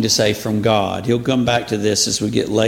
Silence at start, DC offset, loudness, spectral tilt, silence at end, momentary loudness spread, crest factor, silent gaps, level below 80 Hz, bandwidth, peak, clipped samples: 0 s; under 0.1%; -17 LUFS; -4 dB/octave; 0 s; 3 LU; 16 dB; none; -46 dBFS; 17 kHz; -2 dBFS; under 0.1%